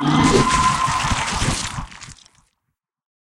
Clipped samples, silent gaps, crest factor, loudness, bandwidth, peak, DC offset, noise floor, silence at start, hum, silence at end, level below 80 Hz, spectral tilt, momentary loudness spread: under 0.1%; none; 18 dB; -18 LUFS; 16 kHz; -2 dBFS; under 0.1%; -77 dBFS; 0 s; none; 1.2 s; -34 dBFS; -4 dB/octave; 21 LU